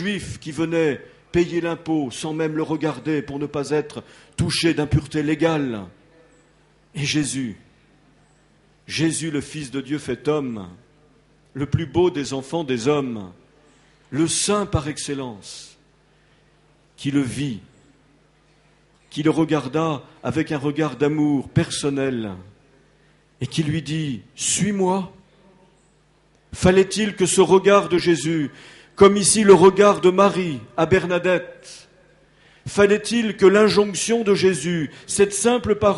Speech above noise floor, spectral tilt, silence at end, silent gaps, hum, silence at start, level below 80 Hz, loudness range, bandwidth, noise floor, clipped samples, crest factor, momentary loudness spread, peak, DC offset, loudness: 38 dB; -5 dB/octave; 0 s; none; none; 0 s; -48 dBFS; 11 LU; 11.5 kHz; -58 dBFS; under 0.1%; 20 dB; 16 LU; 0 dBFS; under 0.1%; -20 LUFS